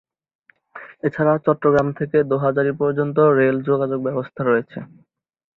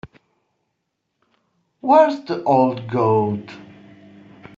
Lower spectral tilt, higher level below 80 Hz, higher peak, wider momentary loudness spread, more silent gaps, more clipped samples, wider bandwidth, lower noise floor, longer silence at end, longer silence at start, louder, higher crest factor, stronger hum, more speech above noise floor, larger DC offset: first, -9.5 dB/octave vs -6.5 dB/octave; first, -56 dBFS vs -62 dBFS; about the same, -4 dBFS vs -2 dBFS; second, 10 LU vs 16 LU; neither; neither; second, 6.2 kHz vs 7.4 kHz; second, -42 dBFS vs -75 dBFS; second, 0.75 s vs 0.95 s; first, 0.75 s vs 0.05 s; about the same, -19 LUFS vs -18 LUFS; about the same, 16 dB vs 18 dB; neither; second, 23 dB vs 58 dB; neither